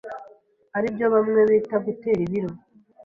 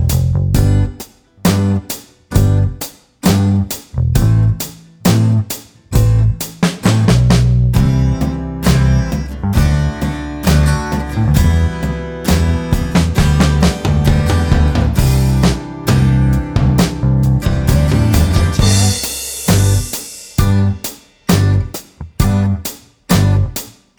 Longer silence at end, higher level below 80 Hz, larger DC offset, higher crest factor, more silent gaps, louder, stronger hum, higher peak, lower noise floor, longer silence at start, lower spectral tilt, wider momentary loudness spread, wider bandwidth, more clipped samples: first, 0.5 s vs 0.3 s; second, -60 dBFS vs -20 dBFS; neither; about the same, 16 dB vs 12 dB; neither; second, -22 LUFS vs -14 LUFS; neither; second, -6 dBFS vs 0 dBFS; first, -52 dBFS vs -35 dBFS; about the same, 0.05 s vs 0 s; first, -9 dB/octave vs -6 dB/octave; first, 15 LU vs 9 LU; second, 5 kHz vs over 20 kHz; neither